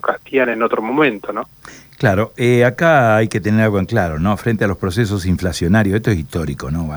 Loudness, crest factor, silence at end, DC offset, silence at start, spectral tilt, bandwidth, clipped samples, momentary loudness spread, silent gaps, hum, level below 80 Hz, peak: -16 LUFS; 14 dB; 0 s; under 0.1%; 0.05 s; -6.5 dB/octave; over 20 kHz; under 0.1%; 10 LU; none; none; -38 dBFS; -2 dBFS